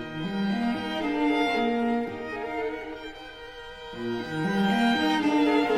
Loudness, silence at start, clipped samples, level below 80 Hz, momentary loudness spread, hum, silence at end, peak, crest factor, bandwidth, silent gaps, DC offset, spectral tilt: -26 LUFS; 0 s; under 0.1%; -54 dBFS; 17 LU; none; 0 s; -12 dBFS; 16 dB; 14 kHz; none; under 0.1%; -6 dB/octave